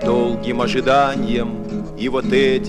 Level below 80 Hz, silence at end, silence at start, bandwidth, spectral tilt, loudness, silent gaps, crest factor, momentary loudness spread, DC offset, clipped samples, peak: -36 dBFS; 0 s; 0 s; 10.5 kHz; -6 dB/octave; -19 LUFS; none; 14 dB; 9 LU; under 0.1%; under 0.1%; -4 dBFS